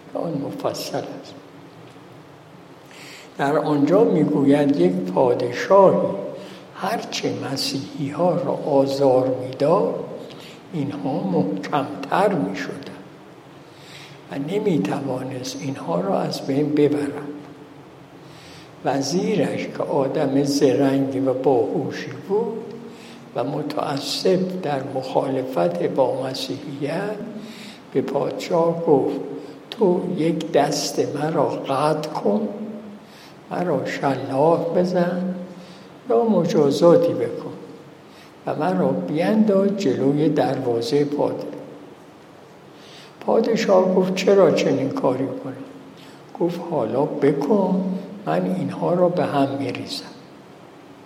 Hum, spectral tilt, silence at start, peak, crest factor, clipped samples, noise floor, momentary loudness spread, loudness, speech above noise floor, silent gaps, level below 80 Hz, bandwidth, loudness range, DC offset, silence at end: none; -6 dB/octave; 0 s; -2 dBFS; 20 dB; under 0.1%; -45 dBFS; 20 LU; -21 LUFS; 25 dB; none; -68 dBFS; 16 kHz; 5 LU; under 0.1%; 0 s